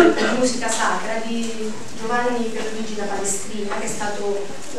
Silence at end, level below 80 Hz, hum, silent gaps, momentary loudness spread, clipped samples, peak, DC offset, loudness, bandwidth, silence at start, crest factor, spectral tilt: 0 s; -56 dBFS; none; none; 8 LU; under 0.1%; -2 dBFS; 5%; -23 LUFS; 14 kHz; 0 s; 22 dB; -3 dB/octave